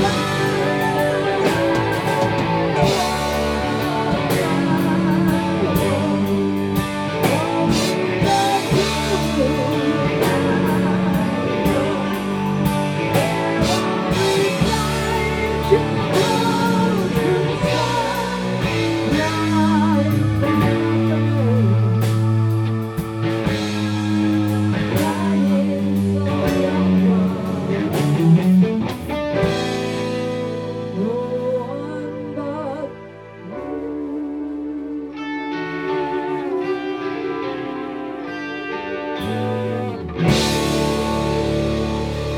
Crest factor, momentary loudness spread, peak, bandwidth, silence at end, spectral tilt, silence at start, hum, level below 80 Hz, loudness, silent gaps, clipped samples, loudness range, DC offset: 18 dB; 9 LU; -2 dBFS; 19.5 kHz; 0 s; -6 dB/octave; 0 s; none; -38 dBFS; -19 LUFS; none; under 0.1%; 7 LU; under 0.1%